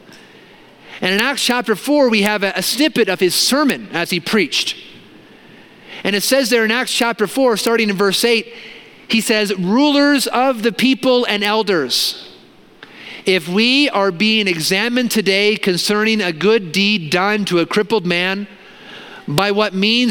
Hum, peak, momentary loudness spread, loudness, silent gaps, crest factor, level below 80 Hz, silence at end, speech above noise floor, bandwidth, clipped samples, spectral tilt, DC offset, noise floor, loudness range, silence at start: none; 0 dBFS; 8 LU; -15 LUFS; none; 16 dB; -60 dBFS; 0 s; 29 dB; 17.5 kHz; under 0.1%; -3.5 dB/octave; under 0.1%; -44 dBFS; 3 LU; 0.1 s